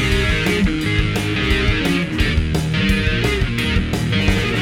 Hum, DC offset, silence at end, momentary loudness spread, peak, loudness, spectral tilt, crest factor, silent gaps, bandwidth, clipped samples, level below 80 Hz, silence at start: none; under 0.1%; 0 s; 2 LU; -2 dBFS; -18 LUFS; -5.5 dB/octave; 14 dB; none; 17.5 kHz; under 0.1%; -24 dBFS; 0 s